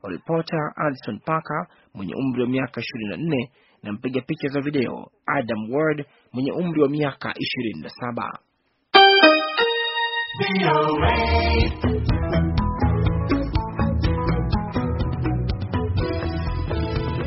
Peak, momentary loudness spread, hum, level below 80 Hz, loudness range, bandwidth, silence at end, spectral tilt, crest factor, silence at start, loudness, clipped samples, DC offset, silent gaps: 0 dBFS; 11 LU; none; -32 dBFS; 9 LU; 5.8 kHz; 0 s; -4 dB/octave; 22 dB; 0.05 s; -22 LUFS; under 0.1%; under 0.1%; none